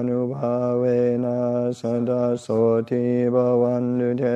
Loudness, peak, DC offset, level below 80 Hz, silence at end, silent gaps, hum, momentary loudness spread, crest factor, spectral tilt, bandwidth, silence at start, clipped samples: -22 LUFS; -8 dBFS; under 0.1%; -62 dBFS; 0 s; none; none; 4 LU; 12 dB; -9 dB/octave; 8.6 kHz; 0 s; under 0.1%